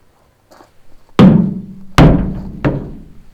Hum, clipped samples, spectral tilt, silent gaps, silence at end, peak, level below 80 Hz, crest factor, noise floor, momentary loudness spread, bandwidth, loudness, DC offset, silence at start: none; 1%; -8 dB/octave; none; 0.3 s; 0 dBFS; -24 dBFS; 14 dB; -51 dBFS; 17 LU; 11.5 kHz; -12 LUFS; under 0.1%; 0.85 s